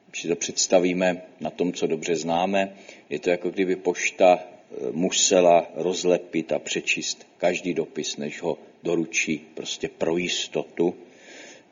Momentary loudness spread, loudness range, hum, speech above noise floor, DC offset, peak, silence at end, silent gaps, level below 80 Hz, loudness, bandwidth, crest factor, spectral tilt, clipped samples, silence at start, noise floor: 12 LU; 5 LU; none; 21 dB; under 0.1%; -4 dBFS; 0.15 s; none; -66 dBFS; -24 LUFS; 7.6 kHz; 20 dB; -3 dB/octave; under 0.1%; 0.15 s; -46 dBFS